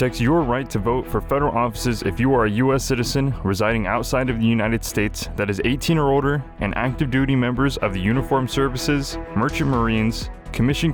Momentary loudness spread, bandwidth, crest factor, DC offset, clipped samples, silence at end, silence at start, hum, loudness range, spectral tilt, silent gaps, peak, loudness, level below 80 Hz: 5 LU; over 20 kHz; 14 dB; under 0.1%; under 0.1%; 0 s; 0 s; none; 1 LU; -6 dB/octave; none; -6 dBFS; -21 LUFS; -34 dBFS